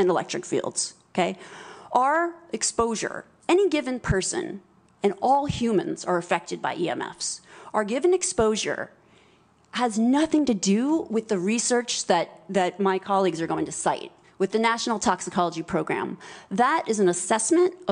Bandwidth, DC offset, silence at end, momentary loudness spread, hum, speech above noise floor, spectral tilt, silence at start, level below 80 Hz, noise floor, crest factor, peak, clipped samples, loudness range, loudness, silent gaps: 10.5 kHz; under 0.1%; 0 s; 9 LU; none; 35 dB; -4 dB/octave; 0 s; -52 dBFS; -59 dBFS; 18 dB; -8 dBFS; under 0.1%; 3 LU; -25 LUFS; none